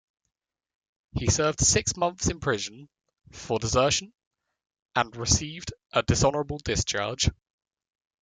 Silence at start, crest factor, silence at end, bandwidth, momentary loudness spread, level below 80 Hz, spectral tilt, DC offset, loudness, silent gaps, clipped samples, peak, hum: 1.15 s; 22 dB; 0.9 s; 10.5 kHz; 10 LU; -44 dBFS; -3.5 dB/octave; under 0.1%; -26 LUFS; 4.27-4.31 s, 4.79-4.83 s; under 0.1%; -8 dBFS; none